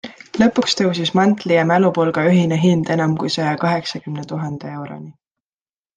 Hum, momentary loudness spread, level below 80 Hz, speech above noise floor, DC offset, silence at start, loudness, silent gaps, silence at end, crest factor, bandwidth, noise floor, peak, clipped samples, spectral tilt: none; 14 LU; -58 dBFS; over 73 dB; under 0.1%; 0.05 s; -17 LUFS; none; 0.85 s; 16 dB; 9.4 kHz; under -90 dBFS; -2 dBFS; under 0.1%; -6 dB/octave